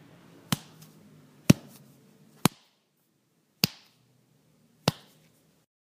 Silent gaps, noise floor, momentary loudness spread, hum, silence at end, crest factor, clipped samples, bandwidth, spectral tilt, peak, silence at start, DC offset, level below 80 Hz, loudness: none; -71 dBFS; 9 LU; none; 1.05 s; 32 dB; under 0.1%; 15.5 kHz; -4.5 dB/octave; 0 dBFS; 0.5 s; under 0.1%; -62 dBFS; -29 LUFS